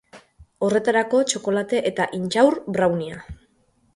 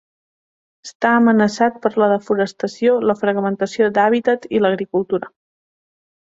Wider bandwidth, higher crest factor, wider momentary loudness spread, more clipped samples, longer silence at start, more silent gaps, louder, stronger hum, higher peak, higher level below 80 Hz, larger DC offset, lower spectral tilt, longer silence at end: first, 11.5 kHz vs 8 kHz; about the same, 18 dB vs 16 dB; about the same, 8 LU vs 7 LU; neither; second, 0.15 s vs 0.85 s; second, none vs 0.95-1.00 s; second, -21 LUFS vs -17 LUFS; neither; about the same, -4 dBFS vs -2 dBFS; first, -54 dBFS vs -64 dBFS; neither; second, -4.5 dB/octave vs -6 dB/octave; second, 0.6 s vs 1 s